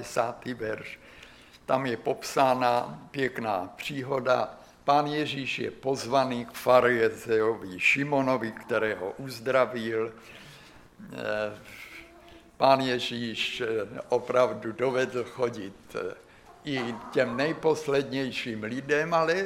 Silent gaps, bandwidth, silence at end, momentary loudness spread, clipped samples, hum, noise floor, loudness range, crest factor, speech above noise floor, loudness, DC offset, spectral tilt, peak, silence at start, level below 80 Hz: none; 16.5 kHz; 0 s; 13 LU; under 0.1%; none; -52 dBFS; 5 LU; 22 dB; 24 dB; -28 LUFS; under 0.1%; -5 dB/octave; -6 dBFS; 0 s; -64 dBFS